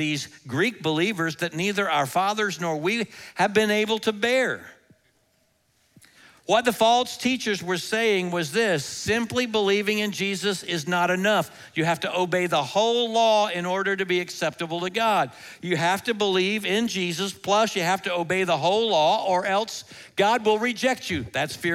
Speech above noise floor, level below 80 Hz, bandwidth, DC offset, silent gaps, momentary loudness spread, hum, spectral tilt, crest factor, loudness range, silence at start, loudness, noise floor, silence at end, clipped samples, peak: 43 dB; -64 dBFS; 16.5 kHz; under 0.1%; none; 7 LU; none; -4 dB/octave; 18 dB; 3 LU; 0 s; -24 LUFS; -67 dBFS; 0 s; under 0.1%; -6 dBFS